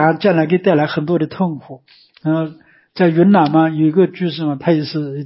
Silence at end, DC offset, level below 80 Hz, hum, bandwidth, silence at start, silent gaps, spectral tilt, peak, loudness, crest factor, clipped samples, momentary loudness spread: 0 s; under 0.1%; -62 dBFS; none; 5.8 kHz; 0 s; none; -12 dB/octave; 0 dBFS; -15 LUFS; 14 dB; under 0.1%; 10 LU